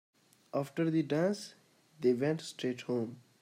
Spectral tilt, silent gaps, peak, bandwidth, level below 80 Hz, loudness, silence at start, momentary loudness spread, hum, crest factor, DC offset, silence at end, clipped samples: -6.5 dB/octave; none; -18 dBFS; 15 kHz; -82 dBFS; -34 LUFS; 0.55 s; 9 LU; none; 16 dB; under 0.1%; 0.25 s; under 0.1%